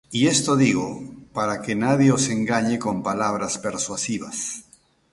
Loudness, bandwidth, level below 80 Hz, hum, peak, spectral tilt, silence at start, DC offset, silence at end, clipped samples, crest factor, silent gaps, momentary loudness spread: -22 LUFS; 11.5 kHz; -56 dBFS; none; -6 dBFS; -4.5 dB/octave; 0.1 s; under 0.1%; 0.5 s; under 0.1%; 18 dB; none; 12 LU